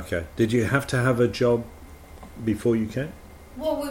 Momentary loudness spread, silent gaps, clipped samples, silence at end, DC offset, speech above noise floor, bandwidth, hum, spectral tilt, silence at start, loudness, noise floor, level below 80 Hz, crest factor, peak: 19 LU; none; under 0.1%; 0 s; under 0.1%; 20 dB; 16.5 kHz; none; -6.5 dB/octave; 0 s; -24 LUFS; -43 dBFS; -46 dBFS; 18 dB; -8 dBFS